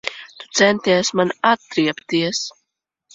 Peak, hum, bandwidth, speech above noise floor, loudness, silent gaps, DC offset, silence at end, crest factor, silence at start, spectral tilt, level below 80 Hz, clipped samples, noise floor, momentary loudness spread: -2 dBFS; none; 8 kHz; 58 dB; -18 LUFS; none; under 0.1%; 0.65 s; 18 dB; 0.05 s; -3.5 dB/octave; -64 dBFS; under 0.1%; -76 dBFS; 12 LU